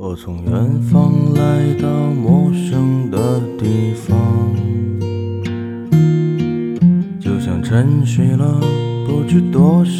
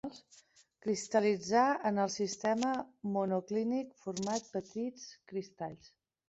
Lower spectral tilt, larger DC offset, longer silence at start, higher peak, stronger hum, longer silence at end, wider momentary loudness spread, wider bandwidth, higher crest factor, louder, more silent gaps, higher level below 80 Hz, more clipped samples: first, -8.5 dB/octave vs -4.5 dB/octave; neither; about the same, 0 s vs 0.05 s; first, 0 dBFS vs -16 dBFS; neither; second, 0 s vs 0.4 s; second, 8 LU vs 13 LU; first, 12.5 kHz vs 8 kHz; about the same, 14 dB vs 18 dB; first, -15 LUFS vs -35 LUFS; neither; first, -44 dBFS vs -76 dBFS; neither